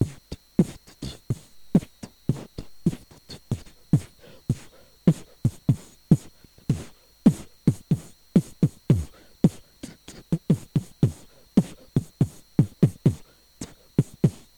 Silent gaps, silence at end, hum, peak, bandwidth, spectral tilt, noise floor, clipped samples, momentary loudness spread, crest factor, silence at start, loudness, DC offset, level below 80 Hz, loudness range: none; 0.25 s; none; -6 dBFS; 19.5 kHz; -8 dB/octave; -49 dBFS; under 0.1%; 19 LU; 20 dB; 0 s; -26 LUFS; under 0.1%; -46 dBFS; 4 LU